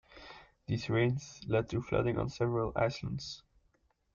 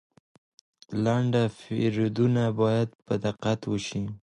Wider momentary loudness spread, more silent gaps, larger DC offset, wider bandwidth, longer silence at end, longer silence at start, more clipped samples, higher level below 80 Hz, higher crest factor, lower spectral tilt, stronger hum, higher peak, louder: first, 19 LU vs 6 LU; second, none vs 2.95-2.99 s; neither; second, 7.4 kHz vs 10 kHz; first, 0.75 s vs 0.15 s; second, 0.1 s vs 0.9 s; neither; about the same, -56 dBFS vs -58 dBFS; about the same, 18 dB vs 16 dB; about the same, -6.5 dB/octave vs -7 dB/octave; neither; second, -18 dBFS vs -12 dBFS; second, -34 LUFS vs -27 LUFS